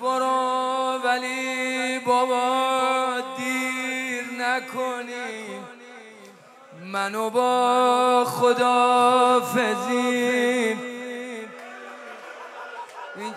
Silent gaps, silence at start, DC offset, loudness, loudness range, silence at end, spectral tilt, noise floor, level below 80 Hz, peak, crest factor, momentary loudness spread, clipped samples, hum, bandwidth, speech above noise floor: none; 0 s; under 0.1%; -22 LUFS; 9 LU; 0 s; -3 dB/octave; -48 dBFS; -88 dBFS; -8 dBFS; 16 dB; 20 LU; under 0.1%; none; 15.5 kHz; 27 dB